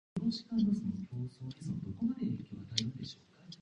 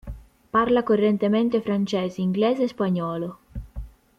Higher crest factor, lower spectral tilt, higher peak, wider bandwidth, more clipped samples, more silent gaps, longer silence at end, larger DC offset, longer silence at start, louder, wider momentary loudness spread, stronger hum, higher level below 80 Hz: first, 26 dB vs 14 dB; second, -6 dB/octave vs -7.5 dB/octave; about the same, -10 dBFS vs -8 dBFS; first, 10 kHz vs 7.6 kHz; neither; neither; second, 0.05 s vs 0.3 s; neither; about the same, 0.15 s vs 0.05 s; second, -37 LUFS vs -23 LUFS; second, 13 LU vs 19 LU; neither; second, -64 dBFS vs -44 dBFS